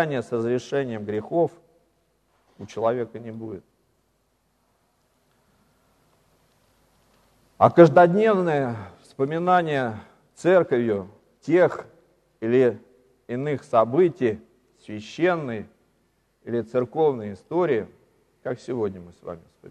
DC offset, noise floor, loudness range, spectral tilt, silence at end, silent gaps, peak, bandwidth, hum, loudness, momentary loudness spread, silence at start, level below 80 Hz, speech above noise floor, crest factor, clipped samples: under 0.1%; -69 dBFS; 14 LU; -7.5 dB/octave; 0.35 s; none; -2 dBFS; 9.6 kHz; none; -22 LUFS; 20 LU; 0 s; -66 dBFS; 47 dB; 22 dB; under 0.1%